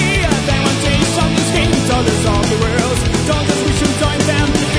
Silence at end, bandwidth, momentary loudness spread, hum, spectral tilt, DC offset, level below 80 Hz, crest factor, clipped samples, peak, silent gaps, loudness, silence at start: 0 s; 11 kHz; 1 LU; none; -4.5 dB/octave; under 0.1%; -24 dBFS; 14 dB; under 0.1%; 0 dBFS; none; -14 LUFS; 0 s